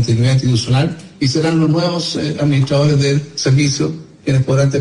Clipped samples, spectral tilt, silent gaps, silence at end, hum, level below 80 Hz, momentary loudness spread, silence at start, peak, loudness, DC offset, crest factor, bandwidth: under 0.1%; -6 dB/octave; none; 0 s; none; -44 dBFS; 6 LU; 0 s; -4 dBFS; -15 LUFS; under 0.1%; 10 dB; 11 kHz